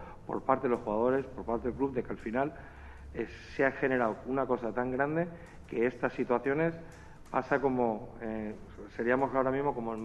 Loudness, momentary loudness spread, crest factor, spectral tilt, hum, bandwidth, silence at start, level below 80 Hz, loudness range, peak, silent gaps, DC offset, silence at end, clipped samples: -32 LUFS; 13 LU; 20 dB; -8 dB/octave; none; 10 kHz; 0 s; -54 dBFS; 2 LU; -12 dBFS; none; under 0.1%; 0 s; under 0.1%